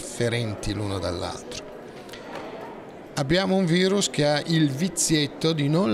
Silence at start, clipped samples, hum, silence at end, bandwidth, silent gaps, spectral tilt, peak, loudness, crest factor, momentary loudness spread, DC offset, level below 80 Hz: 0 s; under 0.1%; none; 0 s; 15 kHz; none; -4.5 dB/octave; -10 dBFS; -24 LUFS; 14 dB; 17 LU; under 0.1%; -48 dBFS